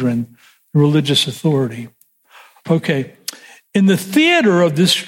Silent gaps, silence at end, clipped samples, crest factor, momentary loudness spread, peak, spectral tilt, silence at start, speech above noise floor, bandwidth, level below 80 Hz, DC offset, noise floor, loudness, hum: none; 0 s; under 0.1%; 14 dB; 17 LU; -2 dBFS; -5 dB/octave; 0 s; 32 dB; 16.5 kHz; -62 dBFS; under 0.1%; -47 dBFS; -15 LUFS; none